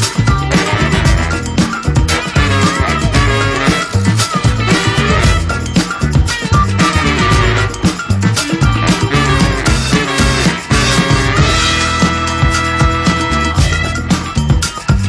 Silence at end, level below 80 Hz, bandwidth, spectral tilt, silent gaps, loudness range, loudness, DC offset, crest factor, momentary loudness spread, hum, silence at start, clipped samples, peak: 0 s; -20 dBFS; 11 kHz; -4.5 dB/octave; none; 1 LU; -12 LUFS; under 0.1%; 12 dB; 4 LU; none; 0 s; under 0.1%; 0 dBFS